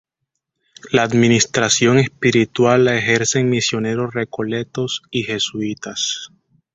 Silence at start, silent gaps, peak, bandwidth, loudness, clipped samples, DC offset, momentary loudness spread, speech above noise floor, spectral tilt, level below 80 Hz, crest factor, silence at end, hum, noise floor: 0.85 s; none; -2 dBFS; 8.2 kHz; -17 LUFS; under 0.1%; under 0.1%; 10 LU; 60 dB; -4 dB/octave; -54 dBFS; 16 dB; 0.5 s; none; -77 dBFS